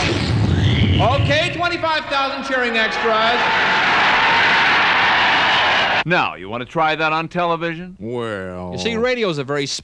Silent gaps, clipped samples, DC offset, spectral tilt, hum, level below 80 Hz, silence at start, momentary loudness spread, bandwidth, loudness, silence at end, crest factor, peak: none; under 0.1%; under 0.1%; -4.5 dB/octave; none; -38 dBFS; 0 s; 12 LU; 10.5 kHz; -16 LUFS; 0 s; 12 dB; -4 dBFS